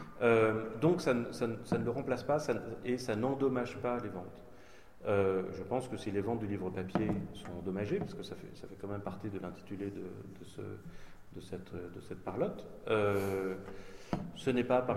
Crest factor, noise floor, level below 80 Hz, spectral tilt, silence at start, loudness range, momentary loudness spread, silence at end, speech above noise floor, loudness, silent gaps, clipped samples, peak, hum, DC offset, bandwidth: 20 dB; -58 dBFS; -60 dBFS; -7 dB/octave; 0 s; 10 LU; 16 LU; 0 s; 22 dB; -35 LUFS; none; under 0.1%; -16 dBFS; none; 0.2%; 15.5 kHz